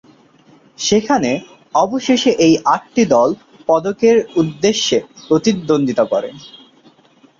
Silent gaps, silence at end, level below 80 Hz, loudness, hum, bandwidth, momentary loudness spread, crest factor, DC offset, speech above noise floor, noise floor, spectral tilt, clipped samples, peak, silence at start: none; 0.85 s; -54 dBFS; -15 LUFS; none; 7.6 kHz; 7 LU; 14 dB; under 0.1%; 36 dB; -50 dBFS; -4.5 dB/octave; under 0.1%; -2 dBFS; 0.8 s